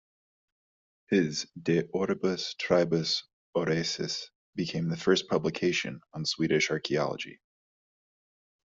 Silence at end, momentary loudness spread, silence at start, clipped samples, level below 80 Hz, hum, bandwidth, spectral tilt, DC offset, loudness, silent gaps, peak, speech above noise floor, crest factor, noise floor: 1.4 s; 8 LU; 1.1 s; under 0.1%; -66 dBFS; none; 7.8 kHz; -4.5 dB/octave; under 0.1%; -29 LUFS; 3.33-3.53 s, 4.35-4.53 s; -10 dBFS; over 61 dB; 20 dB; under -90 dBFS